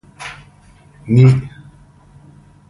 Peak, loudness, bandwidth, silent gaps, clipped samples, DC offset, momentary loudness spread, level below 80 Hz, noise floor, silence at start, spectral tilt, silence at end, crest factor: 0 dBFS; -13 LUFS; 10.5 kHz; none; under 0.1%; under 0.1%; 21 LU; -46 dBFS; -46 dBFS; 0.2 s; -8.5 dB/octave; 1.2 s; 18 dB